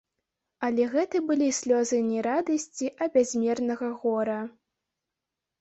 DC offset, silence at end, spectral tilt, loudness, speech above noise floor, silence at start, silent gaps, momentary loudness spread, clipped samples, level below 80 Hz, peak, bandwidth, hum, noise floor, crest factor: under 0.1%; 1.1 s; -4 dB/octave; -27 LUFS; 61 dB; 0.6 s; none; 7 LU; under 0.1%; -72 dBFS; -10 dBFS; 8.2 kHz; none; -87 dBFS; 16 dB